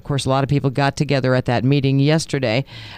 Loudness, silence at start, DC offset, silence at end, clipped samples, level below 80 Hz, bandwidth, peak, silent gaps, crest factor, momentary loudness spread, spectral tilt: -18 LUFS; 0.05 s; under 0.1%; 0 s; under 0.1%; -46 dBFS; 10.5 kHz; -4 dBFS; none; 16 dB; 3 LU; -6.5 dB/octave